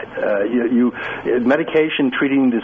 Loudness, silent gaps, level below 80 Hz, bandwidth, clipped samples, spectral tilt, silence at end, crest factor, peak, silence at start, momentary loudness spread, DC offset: -18 LUFS; none; -54 dBFS; 4.6 kHz; under 0.1%; -4 dB/octave; 0 s; 12 dB; -4 dBFS; 0 s; 4 LU; under 0.1%